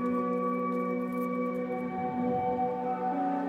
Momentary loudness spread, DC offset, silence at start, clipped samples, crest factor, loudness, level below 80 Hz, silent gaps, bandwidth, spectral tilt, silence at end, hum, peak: 3 LU; under 0.1%; 0 s; under 0.1%; 12 dB; -31 LUFS; -66 dBFS; none; 14 kHz; -9 dB/octave; 0 s; none; -18 dBFS